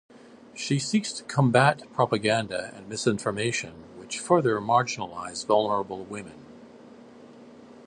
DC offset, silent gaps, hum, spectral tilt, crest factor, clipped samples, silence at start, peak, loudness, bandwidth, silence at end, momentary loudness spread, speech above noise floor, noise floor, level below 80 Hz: under 0.1%; none; none; -5 dB/octave; 22 dB; under 0.1%; 0.15 s; -4 dBFS; -26 LUFS; 11.5 kHz; 0.05 s; 14 LU; 23 dB; -48 dBFS; -64 dBFS